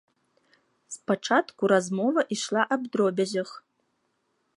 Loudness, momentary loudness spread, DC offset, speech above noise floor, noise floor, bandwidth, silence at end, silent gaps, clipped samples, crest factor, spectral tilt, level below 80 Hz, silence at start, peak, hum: -26 LUFS; 10 LU; under 0.1%; 48 dB; -74 dBFS; 11.5 kHz; 1 s; none; under 0.1%; 20 dB; -4.5 dB/octave; -80 dBFS; 0.9 s; -8 dBFS; none